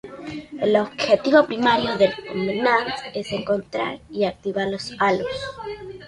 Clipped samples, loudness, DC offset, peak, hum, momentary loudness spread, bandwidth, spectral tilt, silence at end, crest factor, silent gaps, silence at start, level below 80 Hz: under 0.1%; -22 LUFS; under 0.1%; -4 dBFS; none; 14 LU; 11 kHz; -5 dB/octave; 0 s; 18 dB; none; 0.05 s; -54 dBFS